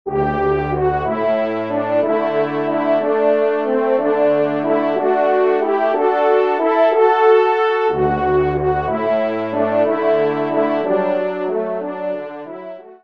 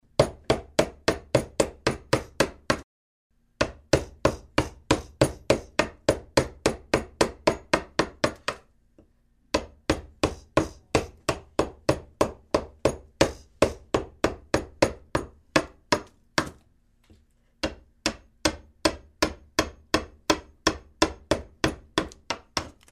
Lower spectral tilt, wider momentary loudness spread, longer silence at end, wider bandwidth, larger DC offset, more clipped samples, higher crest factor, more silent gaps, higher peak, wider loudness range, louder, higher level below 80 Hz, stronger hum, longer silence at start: first, -8.5 dB/octave vs -4 dB/octave; about the same, 7 LU vs 6 LU; about the same, 0.1 s vs 0.2 s; second, 5.6 kHz vs 15.5 kHz; first, 0.3% vs under 0.1%; neither; second, 16 dB vs 24 dB; second, none vs 2.84-3.30 s; about the same, -2 dBFS vs -4 dBFS; about the same, 3 LU vs 4 LU; first, -17 LUFS vs -28 LUFS; about the same, -42 dBFS vs -44 dBFS; neither; second, 0.05 s vs 0.2 s